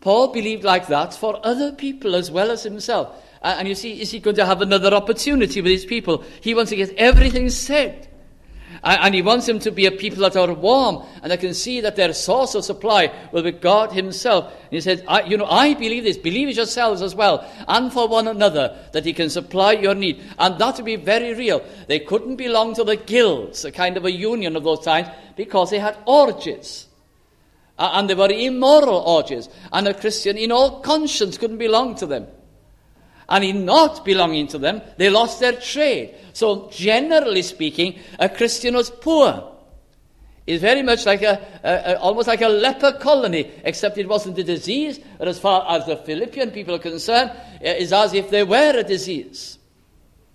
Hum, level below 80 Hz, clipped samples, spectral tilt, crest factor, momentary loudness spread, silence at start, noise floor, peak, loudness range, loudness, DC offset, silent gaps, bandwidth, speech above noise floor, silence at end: none; -34 dBFS; under 0.1%; -4 dB/octave; 18 dB; 10 LU; 0.05 s; -56 dBFS; 0 dBFS; 3 LU; -18 LUFS; under 0.1%; none; 13.5 kHz; 38 dB; 0.8 s